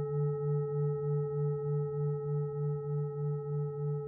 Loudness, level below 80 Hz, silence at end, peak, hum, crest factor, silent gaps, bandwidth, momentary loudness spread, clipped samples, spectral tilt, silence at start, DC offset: -34 LUFS; -68 dBFS; 0 s; -24 dBFS; none; 10 dB; none; 2 kHz; 3 LU; under 0.1%; -15 dB/octave; 0 s; under 0.1%